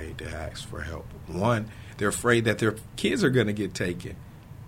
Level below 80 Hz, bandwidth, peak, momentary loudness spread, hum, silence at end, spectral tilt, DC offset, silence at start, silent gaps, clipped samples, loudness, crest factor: -46 dBFS; 16 kHz; -6 dBFS; 16 LU; none; 0 s; -5 dB/octave; under 0.1%; 0 s; none; under 0.1%; -27 LUFS; 22 dB